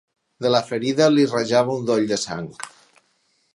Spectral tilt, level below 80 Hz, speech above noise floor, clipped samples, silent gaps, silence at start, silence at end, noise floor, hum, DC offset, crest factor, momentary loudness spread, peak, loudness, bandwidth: -5 dB/octave; -64 dBFS; 46 dB; under 0.1%; none; 0.4 s; 0.85 s; -66 dBFS; none; under 0.1%; 20 dB; 16 LU; -2 dBFS; -20 LUFS; 11.5 kHz